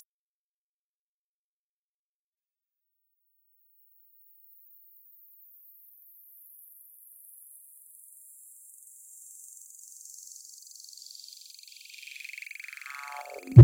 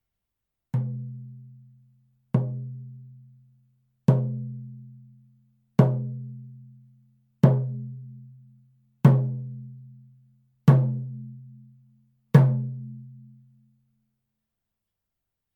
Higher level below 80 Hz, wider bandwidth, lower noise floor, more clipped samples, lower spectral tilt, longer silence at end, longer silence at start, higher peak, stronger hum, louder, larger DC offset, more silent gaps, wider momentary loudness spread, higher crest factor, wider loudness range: first, -62 dBFS vs -72 dBFS; first, 17 kHz vs 4.7 kHz; first, under -90 dBFS vs -84 dBFS; neither; second, -7 dB/octave vs -10 dB/octave; second, 0 s vs 2.4 s; first, 13.55 s vs 0.75 s; about the same, 0 dBFS vs -2 dBFS; neither; second, -35 LUFS vs -24 LUFS; neither; neither; second, 12 LU vs 25 LU; first, 30 dB vs 24 dB; first, 14 LU vs 7 LU